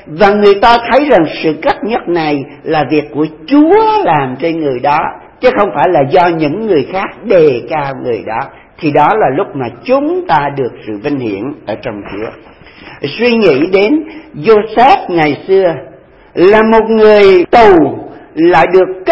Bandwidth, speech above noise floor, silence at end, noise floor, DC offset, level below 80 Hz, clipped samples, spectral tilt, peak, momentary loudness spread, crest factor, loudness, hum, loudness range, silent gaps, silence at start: 8 kHz; 24 dB; 0 s; -34 dBFS; 0.4%; -42 dBFS; 0.7%; -7.5 dB/octave; 0 dBFS; 14 LU; 10 dB; -10 LUFS; none; 7 LU; none; 0.05 s